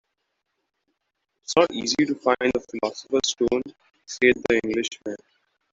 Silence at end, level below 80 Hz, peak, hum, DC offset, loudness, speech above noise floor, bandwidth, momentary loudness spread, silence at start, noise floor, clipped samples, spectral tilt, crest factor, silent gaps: 0.55 s; -58 dBFS; -4 dBFS; none; under 0.1%; -23 LUFS; 55 dB; 8 kHz; 16 LU; 1.5 s; -78 dBFS; under 0.1%; -3 dB/octave; 22 dB; none